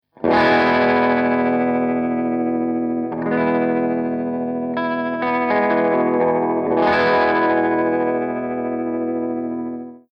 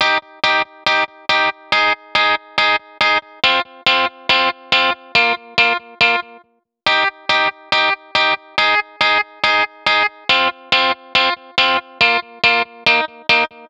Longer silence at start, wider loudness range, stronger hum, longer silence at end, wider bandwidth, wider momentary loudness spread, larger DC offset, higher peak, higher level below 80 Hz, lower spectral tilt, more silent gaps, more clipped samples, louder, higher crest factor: first, 0.2 s vs 0 s; about the same, 3 LU vs 1 LU; neither; about the same, 0.15 s vs 0.05 s; second, 6 kHz vs 11.5 kHz; first, 8 LU vs 2 LU; neither; second, -6 dBFS vs 0 dBFS; about the same, -58 dBFS vs -56 dBFS; first, -8 dB/octave vs -2 dB/octave; neither; neither; second, -19 LUFS vs -15 LUFS; about the same, 14 dB vs 16 dB